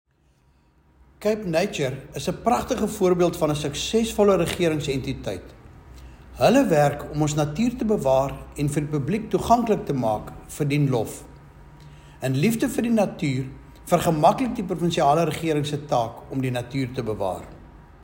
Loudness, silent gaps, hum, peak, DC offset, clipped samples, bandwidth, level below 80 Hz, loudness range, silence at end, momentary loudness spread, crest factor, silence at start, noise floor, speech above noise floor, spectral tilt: -23 LUFS; none; none; -4 dBFS; under 0.1%; under 0.1%; 16.5 kHz; -46 dBFS; 3 LU; 0 s; 10 LU; 20 dB; 1.2 s; -61 dBFS; 39 dB; -6 dB/octave